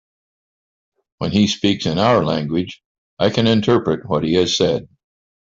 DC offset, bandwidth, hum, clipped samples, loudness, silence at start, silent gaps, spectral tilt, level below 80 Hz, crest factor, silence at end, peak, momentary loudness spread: under 0.1%; 7.8 kHz; none; under 0.1%; -18 LUFS; 1.2 s; 2.85-3.17 s; -5.5 dB/octave; -50 dBFS; 16 dB; 0.7 s; -2 dBFS; 8 LU